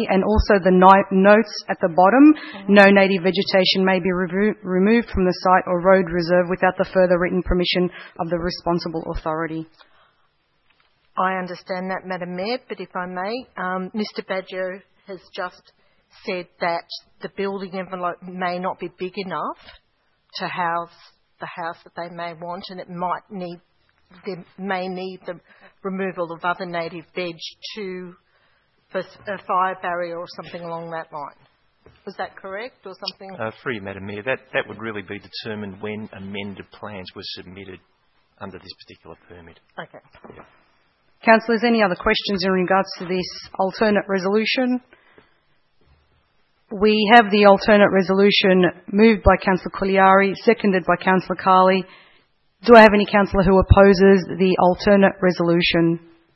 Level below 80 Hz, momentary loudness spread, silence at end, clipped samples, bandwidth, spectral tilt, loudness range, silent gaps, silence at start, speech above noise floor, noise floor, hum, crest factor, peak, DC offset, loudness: -38 dBFS; 20 LU; 0.35 s; under 0.1%; 6 kHz; -7 dB/octave; 16 LU; none; 0 s; 46 dB; -65 dBFS; none; 20 dB; 0 dBFS; under 0.1%; -18 LUFS